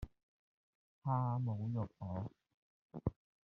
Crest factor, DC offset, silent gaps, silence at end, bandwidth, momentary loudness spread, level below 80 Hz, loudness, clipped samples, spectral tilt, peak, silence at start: 20 dB; under 0.1%; 0.23-1.02 s, 2.54-2.89 s; 0.3 s; 3.8 kHz; 13 LU; -60 dBFS; -41 LUFS; under 0.1%; -11 dB/octave; -22 dBFS; 0 s